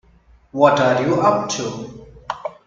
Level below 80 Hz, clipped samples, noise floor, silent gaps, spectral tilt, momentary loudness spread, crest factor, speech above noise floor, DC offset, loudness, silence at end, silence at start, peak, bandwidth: -52 dBFS; under 0.1%; -52 dBFS; none; -5 dB/octave; 18 LU; 20 dB; 35 dB; under 0.1%; -17 LUFS; 0.15 s; 0.55 s; 0 dBFS; 7.8 kHz